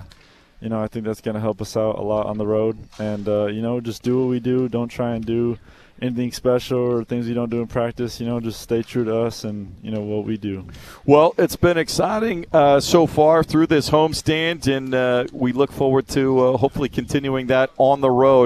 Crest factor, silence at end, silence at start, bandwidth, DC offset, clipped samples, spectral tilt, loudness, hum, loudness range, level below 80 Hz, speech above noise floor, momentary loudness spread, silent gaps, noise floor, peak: 20 dB; 0 s; 0 s; 14 kHz; under 0.1%; under 0.1%; -6 dB/octave; -20 LUFS; none; 7 LU; -46 dBFS; 30 dB; 11 LU; none; -49 dBFS; 0 dBFS